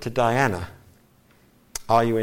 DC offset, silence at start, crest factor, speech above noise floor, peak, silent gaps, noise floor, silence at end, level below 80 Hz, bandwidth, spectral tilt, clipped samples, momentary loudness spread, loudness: under 0.1%; 0 s; 20 dB; 36 dB; -6 dBFS; none; -57 dBFS; 0 s; -50 dBFS; 16.5 kHz; -5.5 dB/octave; under 0.1%; 16 LU; -22 LUFS